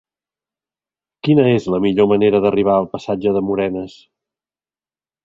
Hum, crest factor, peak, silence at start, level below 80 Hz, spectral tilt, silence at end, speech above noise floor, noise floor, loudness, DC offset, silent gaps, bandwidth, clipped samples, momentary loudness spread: none; 16 dB; -2 dBFS; 1.25 s; -52 dBFS; -8 dB/octave; 1.35 s; over 74 dB; under -90 dBFS; -16 LUFS; under 0.1%; none; 7.6 kHz; under 0.1%; 10 LU